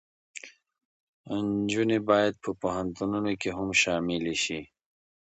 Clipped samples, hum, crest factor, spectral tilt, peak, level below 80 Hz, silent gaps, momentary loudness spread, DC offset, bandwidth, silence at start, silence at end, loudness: under 0.1%; none; 20 dB; -4 dB/octave; -8 dBFS; -58 dBFS; 0.85-1.24 s; 15 LU; under 0.1%; 8.8 kHz; 0.35 s; 0.6 s; -28 LUFS